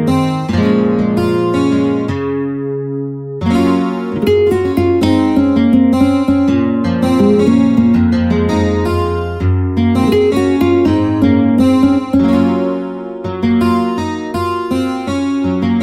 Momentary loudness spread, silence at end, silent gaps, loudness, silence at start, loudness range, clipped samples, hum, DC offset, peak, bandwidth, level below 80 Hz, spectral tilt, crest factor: 8 LU; 0 s; none; -13 LUFS; 0 s; 4 LU; under 0.1%; none; 0.2%; 0 dBFS; 14 kHz; -36 dBFS; -7.5 dB/octave; 12 dB